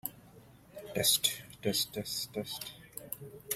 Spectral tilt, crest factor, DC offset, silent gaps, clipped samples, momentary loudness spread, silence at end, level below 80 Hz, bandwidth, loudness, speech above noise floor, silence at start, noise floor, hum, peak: -2 dB/octave; 24 dB; under 0.1%; none; under 0.1%; 18 LU; 0 s; -66 dBFS; 16.5 kHz; -33 LUFS; 23 dB; 0.05 s; -57 dBFS; none; -12 dBFS